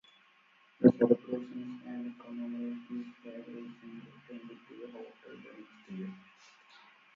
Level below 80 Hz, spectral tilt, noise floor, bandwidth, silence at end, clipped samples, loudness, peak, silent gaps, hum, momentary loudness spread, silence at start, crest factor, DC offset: -80 dBFS; -8 dB/octave; -66 dBFS; 5.8 kHz; 0.95 s; under 0.1%; -33 LUFS; -8 dBFS; none; none; 25 LU; 0.8 s; 28 dB; under 0.1%